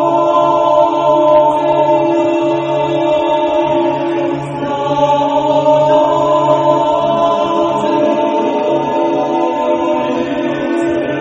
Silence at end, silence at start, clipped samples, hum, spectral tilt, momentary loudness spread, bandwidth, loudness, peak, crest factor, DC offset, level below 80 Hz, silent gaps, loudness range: 0 s; 0 s; under 0.1%; none; -6.5 dB/octave; 5 LU; 8.4 kHz; -13 LUFS; 0 dBFS; 12 dB; under 0.1%; -50 dBFS; none; 2 LU